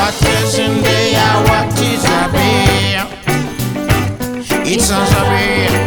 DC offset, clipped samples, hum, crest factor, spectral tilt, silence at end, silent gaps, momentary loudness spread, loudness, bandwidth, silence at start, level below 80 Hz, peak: 0.3%; under 0.1%; none; 12 dB; -4.5 dB/octave; 0 s; none; 6 LU; -13 LUFS; over 20 kHz; 0 s; -28 dBFS; 0 dBFS